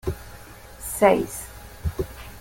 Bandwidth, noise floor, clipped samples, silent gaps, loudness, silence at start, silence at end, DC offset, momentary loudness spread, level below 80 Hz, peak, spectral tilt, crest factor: 17 kHz; -43 dBFS; under 0.1%; none; -24 LUFS; 0.05 s; 0 s; under 0.1%; 24 LU; -40 dBFS; -4 dBFS; -5 dB/octave; 22 dB